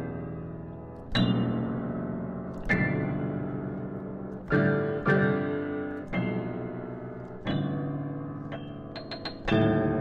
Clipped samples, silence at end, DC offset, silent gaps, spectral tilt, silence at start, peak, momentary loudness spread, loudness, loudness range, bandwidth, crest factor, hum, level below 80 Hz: under 0.1%; 0 s; under 0.1%; none; -8.5 dB/octave; 0 s; -14 dBFS; 14 LU; -30 LUFS; 5 LU; 7 kHz; 16 dB; none; -50 dBFS